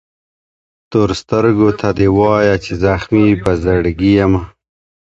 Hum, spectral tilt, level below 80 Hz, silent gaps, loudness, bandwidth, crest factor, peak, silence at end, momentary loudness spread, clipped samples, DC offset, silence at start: none; -7.5 dB/octave; -32 dBFS; none; -13 LUFS; 8.2 kHz; 14 dB; 0 dBFS; 0.55 s; 5 LU; under 0.1%; under 0.1%; 0.9 s